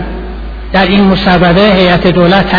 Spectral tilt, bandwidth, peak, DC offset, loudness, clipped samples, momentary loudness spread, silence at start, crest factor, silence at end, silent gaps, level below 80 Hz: -8 dB/octave; 5.4 kHz; 0 dBFS; under 0.1%; -7 LUFS; 0.5%; 16 LU; 0 s; 8 dB; 0 s; none; -22 dBFS